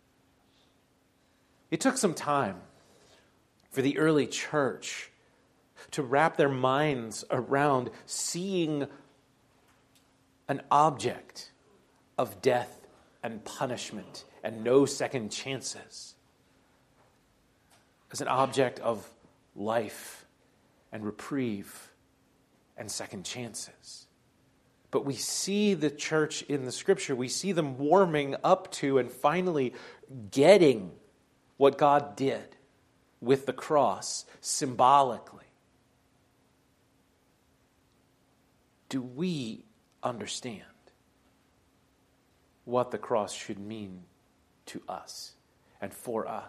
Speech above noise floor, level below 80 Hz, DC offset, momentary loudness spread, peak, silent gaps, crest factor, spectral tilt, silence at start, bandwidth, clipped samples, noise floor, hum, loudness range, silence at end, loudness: 39 dB; -74 dBFS; under 0.1%; 19 LU; -6 dBFS; none; 26 dB; -4.5 dB/octave; 1.7 s; 14 kHz; under 0.1%; -68 dBFS; none; 13 LU; 0 s; -29 LUFS